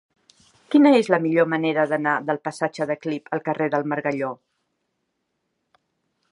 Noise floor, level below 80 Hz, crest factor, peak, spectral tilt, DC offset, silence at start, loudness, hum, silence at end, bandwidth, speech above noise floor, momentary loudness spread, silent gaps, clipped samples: -76 dBFS; -76 dBFS; 22 dB; -2 dBFS; -6.5 dB/octave; under 0.1%; 0.7 s; -22 LUFS; none; 1.95 s; 11 kHz; 55 dB; 12 LU; none; under 0.1%